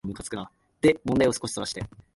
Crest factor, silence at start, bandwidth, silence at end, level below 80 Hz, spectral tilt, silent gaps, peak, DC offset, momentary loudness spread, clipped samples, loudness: 20 dB; 0.05 s; 11.5 kHz; 0.3 s; -52 dBFS; -5 dB/octave; none; -8 dBFS; under 0.1%; 14 LU; under 0.1%; -26 LUFS